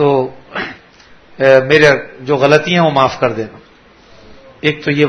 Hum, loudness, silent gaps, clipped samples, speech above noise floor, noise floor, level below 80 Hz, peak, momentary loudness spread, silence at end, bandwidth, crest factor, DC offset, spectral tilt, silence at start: none; -12 LUFS; none; 0.3%; 32 dB; -44 dBFS; -48 dBFS; 0 dBFS; 15 LU; 0 s; 11 kHz; 14 dB; under 0.1%; -5.5 dB/octave; 0 s